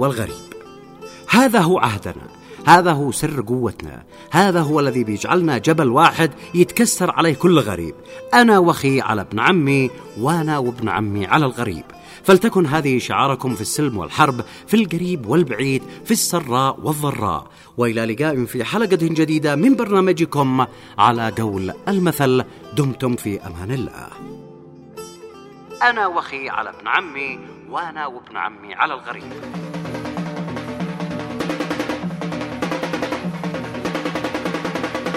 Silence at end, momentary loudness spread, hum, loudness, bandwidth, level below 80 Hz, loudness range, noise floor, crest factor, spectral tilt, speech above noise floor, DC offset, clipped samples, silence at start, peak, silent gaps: 0 s; 16 LU; none; -19 LUFS; 16 kHz; -52 dBFS; 9 LU; -41 dBFS; 18 dB; -5 dB/octave; 23 dB; under 0.1%; under 0.1%; 0 s; 0 dBFS; none